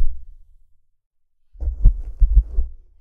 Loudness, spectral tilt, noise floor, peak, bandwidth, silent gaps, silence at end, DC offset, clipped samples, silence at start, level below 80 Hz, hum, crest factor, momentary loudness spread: -23 LUFS; -11.5 dB/octave; -53 dBFS; -2 dBFS; 0.9 kHz; 1.06-1.11 s; 0.25 s; under 0.1%; under 0.1%; 0 s; -20 dBFS; none; 16 dB; 13 LU